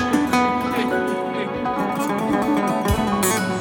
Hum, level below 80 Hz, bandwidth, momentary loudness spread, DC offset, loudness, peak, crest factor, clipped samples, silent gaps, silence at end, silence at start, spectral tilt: none; -38 dBFS; 19.5 kHz; 5 LU; under 0.1%; -21 LUFS; -6 dBFS; 16 dB; under 0.1%; none; 0 s; 0 s; -4.5 dB/octave